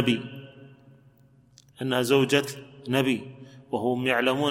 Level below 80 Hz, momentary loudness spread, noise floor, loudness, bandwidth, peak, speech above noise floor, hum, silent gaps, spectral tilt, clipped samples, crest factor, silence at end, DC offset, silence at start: -68 dBFS; 19 LU; -58 dBFS; -25 LUFS; 16.5 kHz; -8 dBFS; 33 dB; none; none; -5 dB/octave; under 0.1%; 20 dB; 0 s; under 0.1%; 0 s